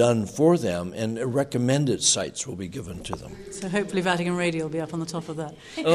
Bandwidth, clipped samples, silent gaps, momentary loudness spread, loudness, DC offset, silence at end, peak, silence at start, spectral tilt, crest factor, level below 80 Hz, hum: 13.5 kHz; under 0.1%; none; 14 LU; -25 LUFS; under 0.1%; 0 s; -6 dBFS; 0 s; -4.5 dB/octave; 18 dB; -54 dBFS; none